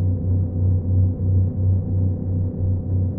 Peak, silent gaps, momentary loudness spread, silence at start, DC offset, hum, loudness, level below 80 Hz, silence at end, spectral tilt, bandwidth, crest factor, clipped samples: -8 dBFS; none; 3 LU; 0 s; under 0.1%; none; -21 LUFS; -36 dBFS; 0 s; -16.5 dB/octave; 1.1 kHz; 10 dB; under 0.1%